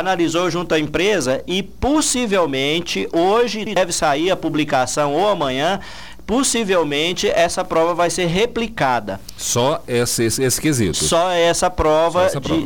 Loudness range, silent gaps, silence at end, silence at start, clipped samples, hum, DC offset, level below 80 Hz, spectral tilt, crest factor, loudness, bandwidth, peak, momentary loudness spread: 1 LU; none; 0 s; 0 s; under 0.1%; none; 1%; -40 dBFS; -3.5 dB/octave; 12 dB; -18 LUFS; over 20 kHz; -6 dBFS; 5 LU